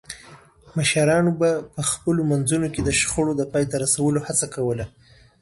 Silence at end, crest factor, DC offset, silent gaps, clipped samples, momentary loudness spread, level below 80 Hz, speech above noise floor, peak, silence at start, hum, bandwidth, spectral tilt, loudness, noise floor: 0.55 s; 16 dB; under 0.1%; none; under 0.1%; 9 LU; -46 dBFS; 26 dB; -6 dBFS; 0.1 s; none; 12 kHz; -4.5 dB/octave; -21 LUFS; -48 dBFS